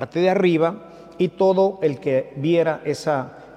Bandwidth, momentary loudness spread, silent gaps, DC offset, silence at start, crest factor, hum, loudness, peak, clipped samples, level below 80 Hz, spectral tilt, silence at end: 11 kHz; 7 LU; none; under 0.1%; 0 s; 14 dB; none; -21 LUFS; -6 dBFS; under 0.1%; -64 dBFS; -7 dB/octave; 0.05 s